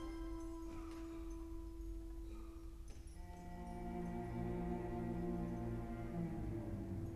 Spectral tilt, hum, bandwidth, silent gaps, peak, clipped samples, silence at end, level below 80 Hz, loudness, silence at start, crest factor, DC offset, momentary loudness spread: -8 dB/octave; none; 14 kHz; none; -32 dBFS; under 0.1%; 0 s; -52 dBFS; -47 LUFS; 0 s; 14 dB; under 0.1%; 11 LU